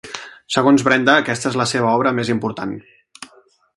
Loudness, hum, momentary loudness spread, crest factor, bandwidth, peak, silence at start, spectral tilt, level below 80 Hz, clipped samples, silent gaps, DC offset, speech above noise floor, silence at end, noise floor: -17 LUFS; none; 16 LU; 18 dB; 11.5 kHz; 0 dBFS; 0.05 s; -4.5 dB/octave; -58 dBFS; under 0.1%; none; under 0.1%; 36 dB; 0.5 s; -53 dBFS